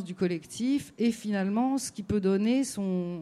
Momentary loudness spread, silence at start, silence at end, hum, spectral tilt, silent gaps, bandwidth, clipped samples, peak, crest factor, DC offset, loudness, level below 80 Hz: 5 LU; 0 s; 0 s; none; -6 dB/octave; none; 14 kHz; under 0.1%; -16 dBFS; 12 dB; under 0.1%; -29 LUFS; -60 dBFS